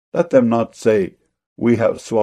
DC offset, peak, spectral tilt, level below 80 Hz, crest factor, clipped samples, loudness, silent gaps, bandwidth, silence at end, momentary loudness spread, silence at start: under 0.1%; 0 dBFS; -7 dB/octave; -56 dBFS; 16 dB; under 0.1%; -17 LUFS; 1.46-1.56 s; 11 kHz; 0 s; 6 LU; 0.15 s